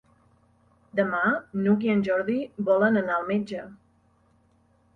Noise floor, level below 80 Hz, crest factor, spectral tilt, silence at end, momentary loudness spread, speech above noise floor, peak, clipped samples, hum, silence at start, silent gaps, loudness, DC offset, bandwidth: -63 dBFS; -66 dBFS; 16 dB; -8.5 dB/octave; 1.2 s; 10 LU; 39 dB; -10 dBFS; under 0.1%; none; 0.95 s; none; -25 LUFS; under 0.1%; 6.2 kHz